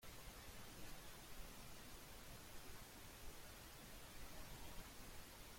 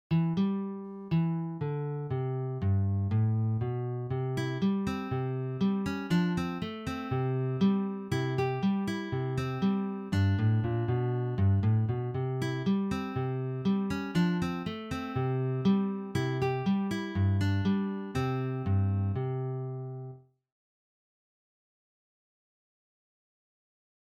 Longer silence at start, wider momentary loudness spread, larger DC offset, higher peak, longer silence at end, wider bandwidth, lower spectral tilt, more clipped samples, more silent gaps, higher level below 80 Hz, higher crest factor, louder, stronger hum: about the same, 0 s vs 0.1 s; second, 1 LU vs 7 LU; neither; second, -40 dBFS vs -16 dBFS; second, 0 s vs 3.9 s; first, 16.5 kHz vs 10.5 kHz; second, -3 dB/octave vs -8 dB/octave; neither; neither; about the same, -62 dBFS vs -58 dBFS; about the same, 16 dB vs 14 dB; second, -58 LUFS vs -31 LUFS; neither